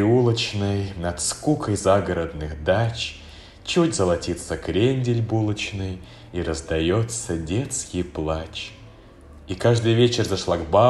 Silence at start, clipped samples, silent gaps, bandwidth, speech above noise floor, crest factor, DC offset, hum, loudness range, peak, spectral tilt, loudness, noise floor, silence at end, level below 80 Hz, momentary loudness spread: 0 s; under 0.1%; none; 12.5 kHz; 23 dB; 18 dB; under 0.1%; none; 3 LU; -4 dBFS; -5.5 dB/octave; -23 LUFS; -45 dBFS; 0 s; -44 dBFS; 12 LU